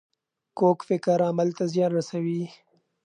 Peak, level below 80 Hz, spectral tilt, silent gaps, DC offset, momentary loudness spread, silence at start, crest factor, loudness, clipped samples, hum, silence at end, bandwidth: -8 dBFS; -78 dBFS; -7.5 dB/octave; none; under 0.1%; 9 LU; 0.55 s; 18 dB; -25 LUFS; under 0.1%; none; 0.55 s; 10 kHz